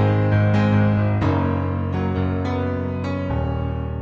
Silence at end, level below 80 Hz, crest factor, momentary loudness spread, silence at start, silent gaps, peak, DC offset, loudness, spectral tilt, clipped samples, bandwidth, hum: 0 s; -36 dBFS; 12 dB; 7 LU; 0 s; none; -6 dBFS; under 0.1%; -21 LUFS; -9.5 dB/octave; under 0.1%; 6.6 kHz; none